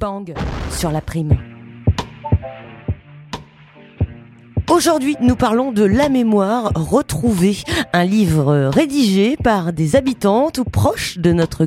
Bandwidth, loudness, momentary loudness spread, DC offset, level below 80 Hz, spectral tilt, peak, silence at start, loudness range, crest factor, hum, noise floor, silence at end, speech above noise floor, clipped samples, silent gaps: 16.5 kHz; -17 LUFS; 12 LU; under 0.1%; -34 dBFS; -6 dB/octave; -2 dBFS; 0 s; 7 LU; 16 dB; none; -43 dBFS; 0 s; 28 dB; under 0.1%; none